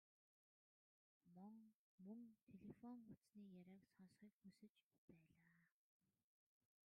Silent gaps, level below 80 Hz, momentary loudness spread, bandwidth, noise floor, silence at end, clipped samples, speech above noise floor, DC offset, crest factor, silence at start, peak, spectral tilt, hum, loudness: 1.75-1.98 s, 2.42-2.47 s, 3.17-3.21 s, 4.33-4.41 s, 4.69-4.75 s, 4.83-4.91 s, 4.98-5.08 s; under -90 dBFS; 8 LU; 4.9 kHz; under -90 dBFS; 1.15 s; under 0.1%; over 23 dB; under 0.1%; 18 dB; 1.25 s; -50 dBFS; -8 dB/octave; none; -65 LUFS